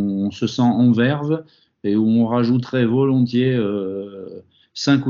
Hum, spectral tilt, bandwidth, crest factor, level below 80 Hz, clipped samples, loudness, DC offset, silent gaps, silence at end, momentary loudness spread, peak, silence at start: none; -6.5 dB/octave; 7.4 kHz; 14 dB; -62 dBFS; under 0.1%; -19 LUFS; under 0.1%; none; 0 s; 14 LU; -4 dBFS; 0 s